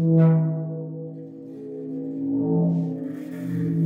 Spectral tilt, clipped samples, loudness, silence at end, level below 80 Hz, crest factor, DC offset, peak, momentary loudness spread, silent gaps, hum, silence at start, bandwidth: -11.5 dB/octave; under 0.1%; -25 LUFS; 0 s; -66 dBFS; 16 dB; under 0.1%; -8 dBFS; 18 LU; none; none; 0 s; 2.6 kHz